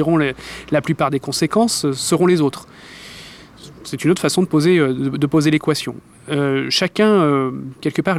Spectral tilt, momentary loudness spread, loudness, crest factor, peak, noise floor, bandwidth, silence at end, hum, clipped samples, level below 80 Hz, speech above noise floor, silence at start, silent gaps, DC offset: -5 dB/octave; 20 LU; -17 LUFS; 14 dB; -4 dBFS; -40 dBFS; 15.5 kHz; 0 s; none; under 0.1%; -52 dBFS; 23 dB; 0 s; none; under 0.1%